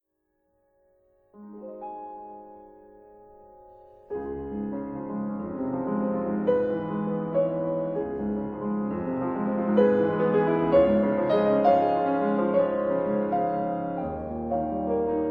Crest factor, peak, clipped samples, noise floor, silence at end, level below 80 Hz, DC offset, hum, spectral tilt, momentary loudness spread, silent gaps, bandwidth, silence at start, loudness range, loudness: 18 dB; -8 dBFS; under 0.1%; -75 dBFS; 0 s; -54 dBFS; under 0.1%; none; -10.5 dB/octave; 16 LU; none; 5.4 kHz; 1.35 s; 19 LU; -26 LUFS